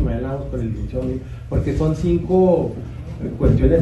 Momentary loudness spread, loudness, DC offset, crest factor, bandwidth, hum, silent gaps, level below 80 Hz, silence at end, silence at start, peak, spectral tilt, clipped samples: 14 LU; -20 LUFS; under 0.1%; 16 dB; 11.5 kHz; none; none; -28 dBFS; 0 s; 0 s; -4 dBFS; -9.5 dB/octave; under 0.1%